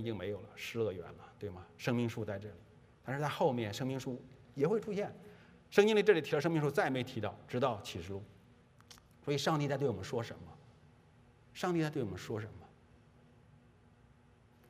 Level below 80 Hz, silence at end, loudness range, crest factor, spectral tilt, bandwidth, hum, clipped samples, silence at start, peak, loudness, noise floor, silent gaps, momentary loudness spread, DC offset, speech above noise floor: -72 dBFS; 2.05 s; 9 LU; 24 dB; -6 dB/octave; 15.5 kHz; none; under 0.1%; 0 s; -12 dBFS; -36 LUFS; -64 dBFS; none; 17 LU; under 0.1%; 29 dB